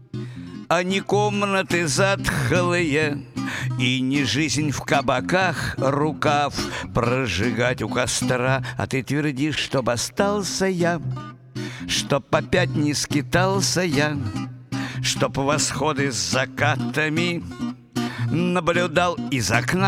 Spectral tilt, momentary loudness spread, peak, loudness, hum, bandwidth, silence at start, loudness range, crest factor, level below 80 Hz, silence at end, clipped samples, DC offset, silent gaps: -4.5 dB/octave; 8 LU; -2 dBFS; -22 LUFS; none; 16.5 kHz; 0 s; 2 LU; 20 dB; -46 dBFS; 0 s; under 0.1%; under 0.1%; none